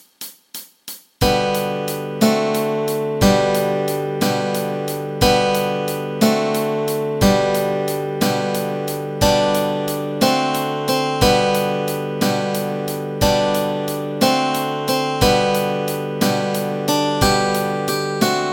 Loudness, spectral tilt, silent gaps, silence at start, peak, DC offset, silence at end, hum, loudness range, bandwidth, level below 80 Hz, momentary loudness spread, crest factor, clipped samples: -19 LUFS; -4.5 dB/octave; none; 0.2 s; 0 dBFS; under 0.1%; 0 s; none; 1 LU; 17 kHz; -38 dBFS; 8 LU; 18 dB; under 0.1%